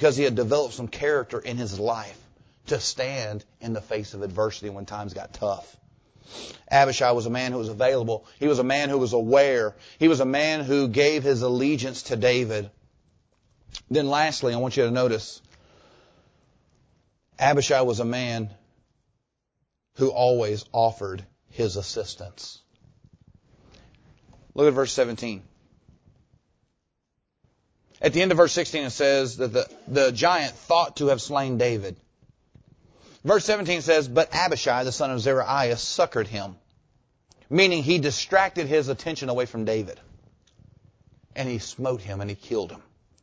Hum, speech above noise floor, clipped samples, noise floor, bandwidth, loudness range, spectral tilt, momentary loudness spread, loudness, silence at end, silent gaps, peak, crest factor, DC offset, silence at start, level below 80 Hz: none; 54 dB; under 0.1%; -78 dBFS; 8 kHz; 8 LU; -4.5 dB/octave; 15 LU; -24 LUFS; 0.45 s; none; -4 dBFS; 22 dB; under 0.1%; 0 s; -56 dBFS